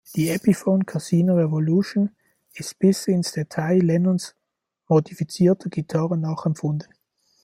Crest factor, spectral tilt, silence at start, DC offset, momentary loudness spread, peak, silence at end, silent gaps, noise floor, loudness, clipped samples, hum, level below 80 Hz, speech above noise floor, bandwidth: 16 dB; -7 dB/octave; 0.1 s; under 0.1%; 8 LU; -6 dBFS; 0.6 s; none; -77 dBFS; -22 LUFS; under 0.1%; none; -62 dBFS; 56 dB; 16 kHz